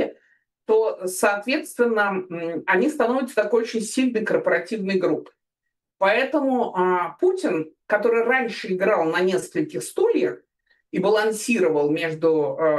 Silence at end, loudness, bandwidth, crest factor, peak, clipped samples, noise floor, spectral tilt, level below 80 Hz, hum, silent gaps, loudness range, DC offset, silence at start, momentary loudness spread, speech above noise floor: 0 s; -22 LUFS; 12.5 kHz; 18 dB; -4 dBFS; under 0.1%; -82 dBFS; -4.5 dB/octave; -74 dBFS; none; none; 1 LU; under 0.1%; 0 s; 7 LU; 60 dB